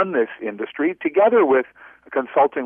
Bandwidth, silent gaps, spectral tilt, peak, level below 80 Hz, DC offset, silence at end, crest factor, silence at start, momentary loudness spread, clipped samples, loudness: 3.6 kHz; none; -9 dB/octave; -6 dBFS; -72 dBFS; under 0.1%; 0 s; 14 dB; 0 s; 13 LU; under 0.1%; -20 LUFS